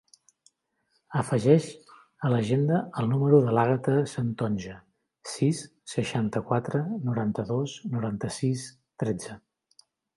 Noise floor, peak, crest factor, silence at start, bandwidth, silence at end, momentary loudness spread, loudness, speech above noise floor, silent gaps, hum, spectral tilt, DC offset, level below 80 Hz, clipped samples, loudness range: -74 dBFS; -6 dBFS; 22 dB; 1.1 s; 11.5 kHz; 0.8 s; 13 LU; -27 LUFS; 48 dB; none; none; -7 dB/octave; under 0.1%; -62 dBFS; under 0.1%; 6 LU